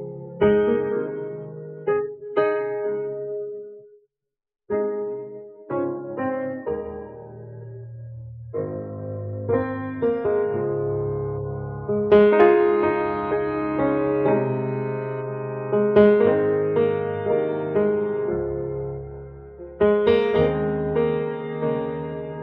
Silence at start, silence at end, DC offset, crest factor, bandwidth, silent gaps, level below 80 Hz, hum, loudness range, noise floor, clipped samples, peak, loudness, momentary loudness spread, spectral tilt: 0 s; 0 s; under 0.1%; 18 dB; 4.3 kHz; none; -50 dBFS; none; 10 LU; -85 dBFS; under 0.1%; -4 dBFS; -23 LUFS; 19 LU; -6.5 dB/octave